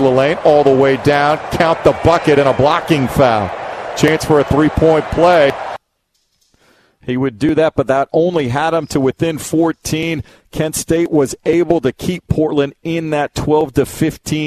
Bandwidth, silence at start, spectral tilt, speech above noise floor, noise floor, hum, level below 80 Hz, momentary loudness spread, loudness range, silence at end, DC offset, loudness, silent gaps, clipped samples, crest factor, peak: 14.5 kHz; 0 s; -5.5 dB/octave; 52 dB; -65 dBFS; none; -36 dBFS; 9 LU; 4 LU; 0 s; under 0.1%; -14 LUFS; none; under 0.1%; 14 dB; 0 dBFS